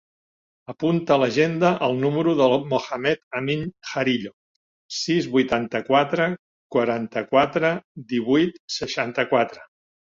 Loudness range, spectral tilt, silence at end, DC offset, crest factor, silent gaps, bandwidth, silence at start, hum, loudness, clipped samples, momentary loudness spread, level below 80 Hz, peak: 2 LU; -5.5 dB/octave; 0.5 s; under 0.1%; 18 dB; 3.23-3.31 s, 4.33-4.89 s, 6.39-6.70 s, 7.84-7.95 s, 8.60-8.68 s; 7.6 kHz; 0.7 s; none; -22 LUFS; under 0.1%; 9 LU; -62 dBFS; -4 dBFS